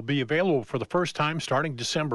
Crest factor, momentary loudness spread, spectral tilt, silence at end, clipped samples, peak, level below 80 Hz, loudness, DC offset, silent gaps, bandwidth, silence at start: 16 dB; 3 LU; -5 dB/octave; 0 s; under 0.1%; -12 dBFS; -64 dBFS; -26 LUFS; under 0.1%; none; 11.5 kHz; 0 s